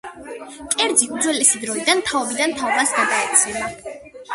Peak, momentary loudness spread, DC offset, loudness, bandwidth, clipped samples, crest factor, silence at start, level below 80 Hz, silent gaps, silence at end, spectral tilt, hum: 0 dBFS; 19 LU; under 0.1%; -17 LUFS; 12 kHz; under 0.1%; 20 dB; 0.05 s; -56 dBFS; none; 0 s; -0.5 dB/octave; none